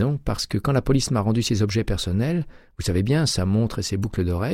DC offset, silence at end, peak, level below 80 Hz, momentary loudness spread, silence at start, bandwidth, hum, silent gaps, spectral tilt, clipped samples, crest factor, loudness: under 0.1%; 0 s; -8 dBFS; -36 dBFS; 5 LU; 0 s; 15.5 kHz; none; none; -5.5 dB/octave; under 0.1%; 14 dB; -23 LUFS